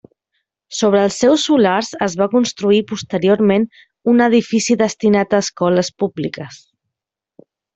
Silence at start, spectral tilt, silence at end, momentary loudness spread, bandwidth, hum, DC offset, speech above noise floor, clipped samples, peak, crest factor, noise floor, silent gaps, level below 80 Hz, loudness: 0.7 s; -5 dB/octave; 1.2 s; 10 LU; 8.2 kHz; none; under 0.1%; 68 dB; under 0.1%; 0 dBFS; 16 dB; -83 dBFS; none; -58 dBFS; -16 LUFS